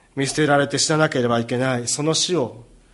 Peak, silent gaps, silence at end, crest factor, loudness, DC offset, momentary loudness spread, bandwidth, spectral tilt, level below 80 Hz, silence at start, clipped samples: -4 dBFS; none; 0.3 s; 16 dB; -20 LUFS; under 0.1%; 5 LU; 11.5 kHz; -4 dB/octave; -56 dBFS; 0.15 s; under 0.1%